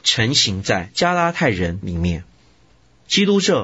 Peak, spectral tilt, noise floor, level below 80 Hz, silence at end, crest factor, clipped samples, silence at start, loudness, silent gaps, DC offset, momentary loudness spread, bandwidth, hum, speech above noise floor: -4 dBFS; -4 dB/octave; -55 dBFS; -42 dBFS; 0 s; 16 dB; under 0.1%; 0.05 s; -18 LUFS; none; under 0.1%; 8 LU; 8 kHz; none; 36 dB